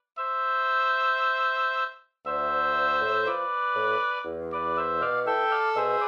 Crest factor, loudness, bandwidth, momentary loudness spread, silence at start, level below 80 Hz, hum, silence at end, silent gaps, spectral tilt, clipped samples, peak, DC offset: 12 dB; -26 LUFS; 7 kHz; 7 LU; 0.15 s; -64 dBFS; none; 0 s; none; -4 dB/octave; under 0.1%; -14 dBFS; under 0.1%